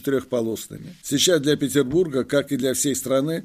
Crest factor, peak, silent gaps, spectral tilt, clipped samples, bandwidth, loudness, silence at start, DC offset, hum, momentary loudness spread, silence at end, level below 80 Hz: 16 dB; -6 dBFS; none; -4 dB/octave; under 0.1%; 15.5 kHz; -21 LUFS; 0.05 s; under 0.1%; none; 10 LU; 0 s; -56 dBFS